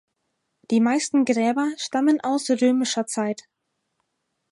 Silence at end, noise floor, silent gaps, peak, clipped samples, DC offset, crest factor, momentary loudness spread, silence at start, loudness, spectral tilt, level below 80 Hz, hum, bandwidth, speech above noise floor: 1.2 s; -77 dBFS; none; -8 dBFS; under 0.1%; under 0.1%; 16 dB; 6 LU; 0.7 s; -22 LUFS; -4 dB/octave; -76 dBFS; none; 11.5 kHz; 55 dB